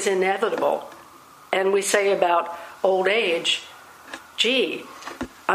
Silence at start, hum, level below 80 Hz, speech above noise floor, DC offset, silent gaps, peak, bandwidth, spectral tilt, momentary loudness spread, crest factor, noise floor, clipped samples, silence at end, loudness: 0 s; none; -62 dBFS; 25 dB; under 0.1%; none; -4 dBFS; 15.5 kHz; -2 dB/octave; 17 LU; 20 dB; -47 dBFS; under 0.1%; 0 s; -22 LUFS